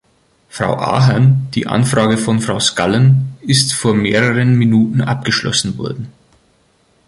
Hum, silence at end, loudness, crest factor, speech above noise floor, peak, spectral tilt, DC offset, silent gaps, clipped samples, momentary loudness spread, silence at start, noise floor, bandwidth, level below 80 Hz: none; 0.95 s; -14 LUFS; 14 dB; 42 dB; 0 dBFS; -5 dB/octave; under 0.1%; none; under 0.1%; 10 LU; 0.55 s; -56 dBFS; 11.5 kHz; -46 dBFS